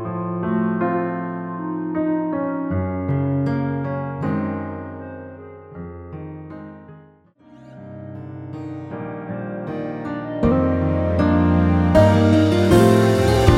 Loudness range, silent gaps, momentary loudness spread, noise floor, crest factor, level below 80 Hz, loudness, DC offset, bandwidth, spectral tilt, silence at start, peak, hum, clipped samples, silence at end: 19 LU; none; 21 LU; -50 dBFS; 20 dB; -36 dBFS; -20 LUFS; under 0.1%; 16 kHz; -7.5 dB/octave; 0 s; 0 dBFS; none; under 0.1%; 0 s